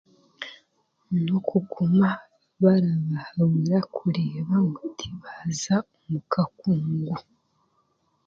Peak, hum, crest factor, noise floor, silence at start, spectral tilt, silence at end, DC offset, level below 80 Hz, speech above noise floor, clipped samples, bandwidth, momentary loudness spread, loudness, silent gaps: -6 dBFS; none; 18 dB; -69 dBFS; 0.4 s; -7 dB/octave; 1.05 s; under 0.1%; -62 dBFS; 45 dB; under 0.1%; 7.6 kHz; 14 LU; -25 LUFS; none